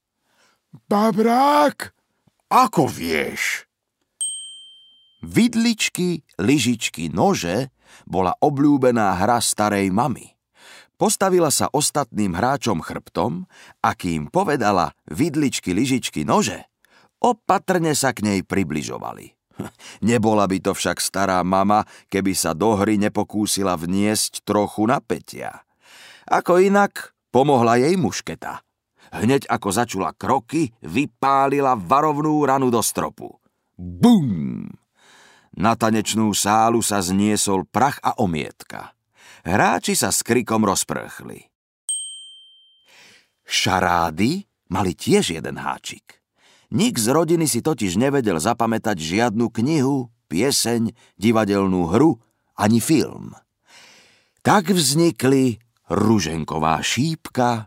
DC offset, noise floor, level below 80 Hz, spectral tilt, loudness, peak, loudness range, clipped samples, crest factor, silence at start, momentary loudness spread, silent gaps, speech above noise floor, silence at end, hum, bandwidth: under 0.1%; -75 dBFS; -54 dBFS; -4.5 dB/octave; -20 LUFS; -2 dBFS; 3 LU; under 0.1%; 18 dB; 0.9 s; 13 LU; 41.55-41.88 s; 56 dB; 0 s; none; 16 kHz